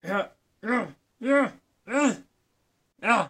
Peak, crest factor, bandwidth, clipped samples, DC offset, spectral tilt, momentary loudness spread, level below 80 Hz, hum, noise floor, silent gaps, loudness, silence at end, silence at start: -6 dBFS; 22 dB; 12 kHz; under 0.1%; under 0.1%; -4.5 dB/octave; 14 LU; -74 dBFS; none; -72 dBFS; none; -27 LUFS; 0 s; 0.05 s